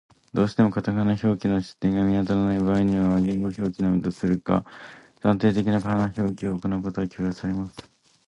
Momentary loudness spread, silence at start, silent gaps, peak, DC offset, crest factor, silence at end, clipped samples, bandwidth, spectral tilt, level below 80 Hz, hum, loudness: 8 LU; 0.35 s; none; -6 dBFS; under 0.1%; 18 dB; 0.45 s; under 0.1%; 9.8 kHz; -8.5 dB/octave; -48 dBFS; none; -24 LUFS